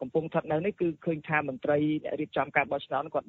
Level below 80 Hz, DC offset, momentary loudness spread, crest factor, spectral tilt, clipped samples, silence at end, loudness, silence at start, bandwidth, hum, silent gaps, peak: -66 dBFS; under 0.1%; 4 LU; 20 dB; -5 dB/octave; under 0.1%; 0.05 s; -30 LUFS; 0 s; 4.2 kHz; none; none; -10 dBFS